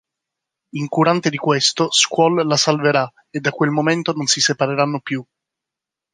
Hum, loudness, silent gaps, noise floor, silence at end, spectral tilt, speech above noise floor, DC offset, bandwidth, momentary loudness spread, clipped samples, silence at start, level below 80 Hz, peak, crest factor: none; -17 LUFS; none; -86 dBFS; 0.9 s; -3.5 dB/octave; 68 dB; under 0.1%; 10.5 kHz; 10 LU; under 0.1%; 0.75 s; -66 dBFS; -2 dBFS; 18 dB